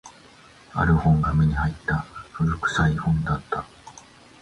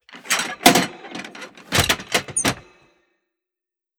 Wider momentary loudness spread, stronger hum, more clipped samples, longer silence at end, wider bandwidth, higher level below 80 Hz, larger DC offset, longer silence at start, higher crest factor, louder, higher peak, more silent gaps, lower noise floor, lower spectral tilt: second, 12 LU vs 20 LU; neither; neither; second, 0.4 s vs 1.4 s; second, 10 kHz vs over 20 kHz; first, -34 dBFS vs -48 dBFS; neither; about the same, 0.05 s vs 0.1 s; second, 16 dB vs 24 dB; second, -23 LUFS vs -19 LUFS; second, -8 dBFS vs 0 dBFS; neither; second, -50 dBFS vs -88 dBFS; first, -7 dB/octave vs -2.5 dB/octave